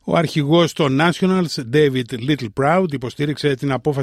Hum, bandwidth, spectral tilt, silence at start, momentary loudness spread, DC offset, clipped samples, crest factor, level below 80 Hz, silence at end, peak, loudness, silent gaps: none; 14 kHz; -6 dB/octave; 0.05 s; 6 LU; under 0.1%; under 0.1%; 16 dB; -52 dBFS; 0 s; -2 dBFS; -18 LUFS; none